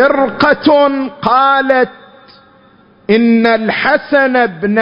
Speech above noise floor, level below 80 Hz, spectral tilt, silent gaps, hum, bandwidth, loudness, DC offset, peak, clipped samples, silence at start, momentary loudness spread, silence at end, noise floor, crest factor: 35 dB; -50 dBFS; -7.5 dB/octave; none; none; 5.4 kHz; -11 LUFS; under 0.1%; 0 dBFS; under 0.1%; 0 s; 5 LU; 0 s; -45 dBFS; 12 dB